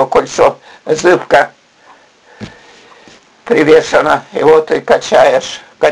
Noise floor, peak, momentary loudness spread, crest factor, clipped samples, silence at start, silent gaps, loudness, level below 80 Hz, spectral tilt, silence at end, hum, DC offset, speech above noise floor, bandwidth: -44 dBFS; 0 dBFS; 19 LU; 12 dB; 0.3%; 0 s; none; -10 LUFS; -46 dBFS; -4 dB/octave; 0 s; none; under 0.1%; 34 dB; 11 kHz